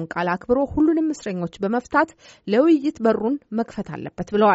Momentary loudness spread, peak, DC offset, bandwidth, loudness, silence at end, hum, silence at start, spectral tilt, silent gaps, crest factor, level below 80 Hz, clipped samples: 11 LU; -4 dBFS; under 0.1%; 8 kHz; -22 LUFS; 0 s; none; 0 s; -5.5 dB/octave; none; 16 dB; -50 dBFS; under 0.1%